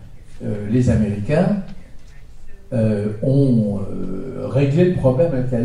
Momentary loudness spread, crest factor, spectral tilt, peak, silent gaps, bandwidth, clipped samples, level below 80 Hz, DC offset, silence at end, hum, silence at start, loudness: 12 LU; 16 dB; -9 dB/octave; -2 dBFS; none; 10.5 kHz; under 0.1%; -34 dBFS; under 0.1%; 0 s; none; 0 s; -19 LUFS